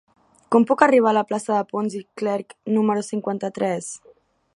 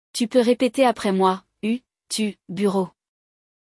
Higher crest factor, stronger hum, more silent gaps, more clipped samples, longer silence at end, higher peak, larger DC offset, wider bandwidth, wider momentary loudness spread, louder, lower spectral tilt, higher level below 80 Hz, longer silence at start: first, 22 dB vs 16 dB; neither; neither; neither; second, 0.6 s vs 0.9 s; first, 0 dBFS vs -6 dBFS; neither; about the same, 11.5 kHz vs 12 kHz; first, 13 LU vs 9 LU; about the same, -21 LUFS vs -22 LUFS; about the same, -5.5 dB/octave vs -5 dB/octave; about the same, -72 dBFS vs -68 dBFS; first, 0.5 s vs 0.15 s